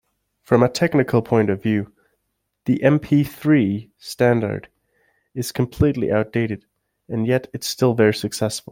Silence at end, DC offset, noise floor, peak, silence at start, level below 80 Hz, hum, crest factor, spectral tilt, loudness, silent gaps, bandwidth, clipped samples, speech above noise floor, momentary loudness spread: 0.15 s; under 0.1%; -74 dBFS; -2 dBFS; 0.5 s; -48 dBFS; none; 18 dB; -6.5 dB/octave; -20 LUFS; none; 17 kHz; under 0.1%; 55 dB; 12 LU